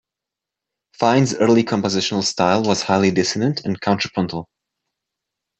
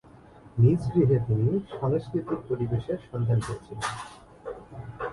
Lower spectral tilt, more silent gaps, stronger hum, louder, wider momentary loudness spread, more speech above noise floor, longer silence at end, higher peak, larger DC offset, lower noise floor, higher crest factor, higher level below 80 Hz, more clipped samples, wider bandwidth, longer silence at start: second, -5 dB/octave vs -8 dB/octave; neither; neither; first, -18 LUFS vs -27 LUFS; second, 6 LU vs 18 LU; first, 68 dB vs 25 dB; first, 1.15 s vs 0 s; first, -2 dBFS vs -10 dBFS; neither; first, -86 dBFS vs -51 dBFS; about the same, 18 dB vs 18 dB; second, -60 dBFS vs -50 dBFS; neither; second, 8.4 kHz vs 11.5 kHz; first, 1 s vs 0.45 s